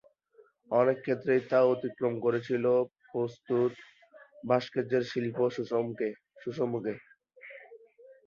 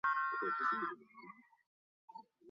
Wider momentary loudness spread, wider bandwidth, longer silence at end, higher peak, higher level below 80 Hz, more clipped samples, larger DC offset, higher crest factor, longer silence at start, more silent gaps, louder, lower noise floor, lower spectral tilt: second, 14 LU vs 22 LU; about the same, 7 kHz vs 7.2 kHz; first, 0.15 s vs 0 s; first, -10 dBFS vs -26 dBFS; first, -74 dBFS vs -90 dBFS; neither; neither; about the same, 20 dB vs 16 dB; first, 0.7 s vs 0.05 s; second, none vs 1.66-2.08 s; first, -30 LUFS vs -37 LUFS; first, -63 dBFS vs -58 dBFS; first, -7.5 dB/octave vs -1.5 dB/octave